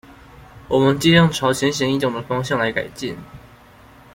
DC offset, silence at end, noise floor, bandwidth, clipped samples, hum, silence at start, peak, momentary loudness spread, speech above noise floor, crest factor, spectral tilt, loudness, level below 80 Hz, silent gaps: under 0.1%; 0.75 s; -46 dBFS; 16.5 kHz; under 0.1%; none; 0.1 s; -2 dBFS; 15 LU; 28 dB; 18 dB; -5 dB/octave; -18 LUFS; -48 dBFS; none